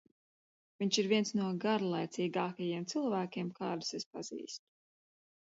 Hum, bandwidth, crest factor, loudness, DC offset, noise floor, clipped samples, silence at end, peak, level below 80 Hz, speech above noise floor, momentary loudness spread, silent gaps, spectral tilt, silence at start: none; 7.6 kHz; 20 dB; -36 LUFS; under 0.1%; under -90 dBFS; under 0.1%; 1 s; -18 dBFS; -82 dBFS; over 55 dB; 12 LU; 4.06-4.11 s; -4.5 dB/octave; 0.8 s